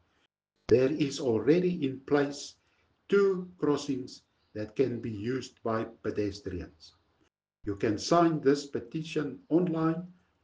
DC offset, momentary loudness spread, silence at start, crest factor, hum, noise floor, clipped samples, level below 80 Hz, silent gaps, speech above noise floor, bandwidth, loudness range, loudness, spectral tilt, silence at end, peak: under 0.1%; 16 LU; 0.7 s; 20 dB; none; -75 dBFS; under 0.1%; -60 dBFS; none; 46 dB; 9.6 kHz; 6 LU; -30 LUFS; -6.5 dB/octave; 0.3 s; -10 dBFS